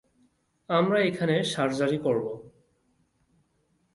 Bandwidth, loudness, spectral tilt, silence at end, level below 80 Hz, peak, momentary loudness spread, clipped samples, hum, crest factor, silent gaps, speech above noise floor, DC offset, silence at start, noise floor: 11.5 kHz; -26 LUFS; -5.5 dB/octave; 1.45 s; -68 dBFS; -10 dBFS; 7 LU; under 0.1%; none; 18 dB; none; 45 dB; under 0.1%; 0.7 s; -71 dBFS